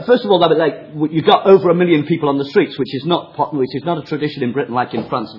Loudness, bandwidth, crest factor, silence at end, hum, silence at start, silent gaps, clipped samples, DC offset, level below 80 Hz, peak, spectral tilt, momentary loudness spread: -16 LUFS; 6 kHz; 16 dB; 0 s; none; 0 s; none; under 0.1%; under 0.1%; -58 dBFS; 0 dBFS; -8.5 dB/octave; 10 LU